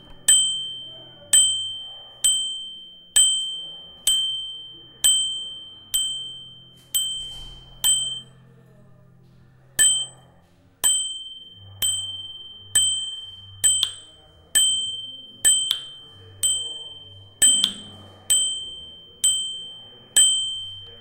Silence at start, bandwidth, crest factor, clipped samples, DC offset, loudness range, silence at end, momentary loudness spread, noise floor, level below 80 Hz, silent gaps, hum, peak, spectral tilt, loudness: 0.1 s; 16 kHz; 22 dB; under 0.1%; under 0.1%; 4 LU; 0 s; 22 LU; -55 dBFS; -56 dBFS; none; none; -2 dBFS; 2.5 dB/octave; -20 LUFS